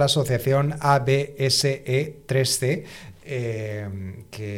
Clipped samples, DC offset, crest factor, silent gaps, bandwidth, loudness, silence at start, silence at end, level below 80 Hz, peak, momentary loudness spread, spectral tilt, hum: under 0.1%; under 0.1%; 16 dB; none; 16.5 kHz; -23 LUFS; 0 s; 0 s; -54 dBFS; -6 dBFS; 15 LU; -4.5 dB/octave; none